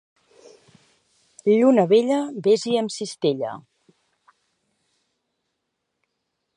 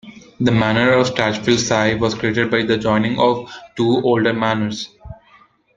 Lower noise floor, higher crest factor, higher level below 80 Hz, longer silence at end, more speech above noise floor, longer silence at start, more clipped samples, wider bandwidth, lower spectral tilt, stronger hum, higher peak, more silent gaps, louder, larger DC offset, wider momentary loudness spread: first, -78 dBFS vs -52 dBFS; about the same, 20 dB vs 18 dB; second, -76 dBFS vs -48 dBFS; first, 2.95 s vs 0.65 s; first, 59 dB vs 35 dB; first, 1.45 s vs 0.05 s; neither; first, 10.5 kHz vs 9.2 kHz; about the same, -5.5 dB/octave vs -5 dB/octave; neither; second, -4 dBFS vs 0 dBFS; neither; second, -20 LUFS vs -17 LUFS; neither; first, 12 LU vs 7 LU